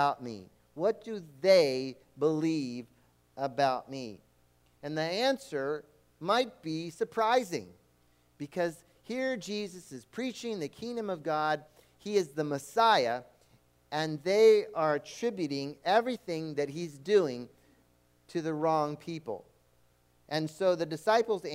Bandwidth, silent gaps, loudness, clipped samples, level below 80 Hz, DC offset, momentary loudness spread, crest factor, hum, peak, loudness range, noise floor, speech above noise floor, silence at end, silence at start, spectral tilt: 16 kHz; none; -31 LUFS; under 0.1%; -74 dBFS; under 0.1%; 17 LU; 20 dB; none; -12 dBFS; 7 LU; -67 dBFS; 37 dB; 0 s; 0 s; -5 dB/octave